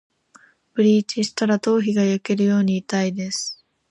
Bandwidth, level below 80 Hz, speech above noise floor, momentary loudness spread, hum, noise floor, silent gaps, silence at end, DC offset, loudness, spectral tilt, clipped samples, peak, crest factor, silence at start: 11 kHz; -68 dBFS; 34 dB; 9 LU; none; -54 dBFS; none; 0.35 s; under 0.1%; -21 LUFS; -5.5 dB/octave; under 0.1%; -6 dBFS; 14 dB; 0.75 s